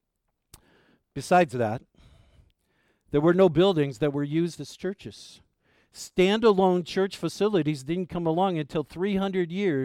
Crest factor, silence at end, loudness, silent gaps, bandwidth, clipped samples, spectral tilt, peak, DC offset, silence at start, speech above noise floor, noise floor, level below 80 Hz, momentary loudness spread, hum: 16 dB; 0 s; -25 LUFS; none; 14.5 kHz; under 0.1%; -6.5 dB/octave; -10 dBFS; under 0.1%; 1.15 s; 54 dB; -79 dBFS; -56 dBFS; 14 LU; none